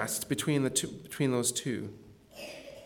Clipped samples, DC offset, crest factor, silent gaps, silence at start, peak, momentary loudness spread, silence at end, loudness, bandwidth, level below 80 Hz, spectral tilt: under 0.1%; under 0.1%; 20 dB; none; 0 s; -14 dBFS; 16 LU; 0 s; -31 LUFS; 19 kHz; -66 dBFS; -4 dB/octave